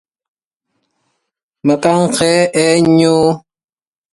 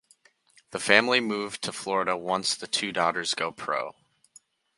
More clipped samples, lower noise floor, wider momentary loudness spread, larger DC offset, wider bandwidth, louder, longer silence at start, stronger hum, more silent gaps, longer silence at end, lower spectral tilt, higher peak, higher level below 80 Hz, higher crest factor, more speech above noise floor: neither; first, under -90 dBFS vs -62 dBFS; second, 6 LU vs 12 LU; neither; about the same, 11.5 kHz vs 11.5 kHz; first, -12 LUFS vs -26 LUFS; first, 1.65 s vs 0.7 s; neither; neither; about the same, 0.75 s vs 0.85 s; first, -5 dB/octave vs -2 dB/octave; about the same, 0 dBFS vs 0 dBFS; first, -52 dBFS vs -70 dBFS; second, 14 dB vs 28 dB; first, over 79 dB vs 35 dB